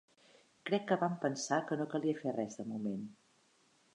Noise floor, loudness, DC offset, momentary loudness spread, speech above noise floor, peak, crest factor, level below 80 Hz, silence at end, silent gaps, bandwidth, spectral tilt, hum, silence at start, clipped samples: -71 dBFS; -37 LUFS; under 0.1%; 9 LU; 35 dB; -18 dBFS; 20 dB; -84 dBFS; 0.8 s; none; 10.5 kHz; -5 dB/octave; none; 0.65 s; under 0.1%